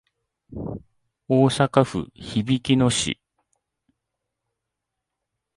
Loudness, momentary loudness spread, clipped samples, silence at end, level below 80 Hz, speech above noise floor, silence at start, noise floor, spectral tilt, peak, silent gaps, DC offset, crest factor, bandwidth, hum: -21 LUFS; 16 LU; under 0.1%; 2.45 s; -52 dBFS; 61 dB; 0.5 s; -83 dBFS; -5.5 dB/octave; -2 dBFS; none; under 0.1%; 22 dB; 11.5 kHz; none